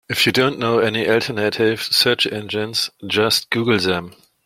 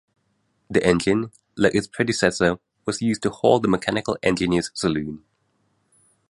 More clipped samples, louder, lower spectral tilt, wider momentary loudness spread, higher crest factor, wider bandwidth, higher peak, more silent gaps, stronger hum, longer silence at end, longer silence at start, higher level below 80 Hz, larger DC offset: neither; first, -18 LUFS vs -22 LUFS; second, -3.5 dB/octave vs -5 dB/octave; second, 6 LU vs 9 LU; about the same, 18 dB vs 20 dB; first, 16.5 kHz vs 11.5 kHz; about the same, 0 dBFS vs -2 dBFS; neither; neither; second, 0.35 s vs 1.1 s; second, 0.1 s vs 0.7 s; second, -58 dBFS vs -50 dBFS; neither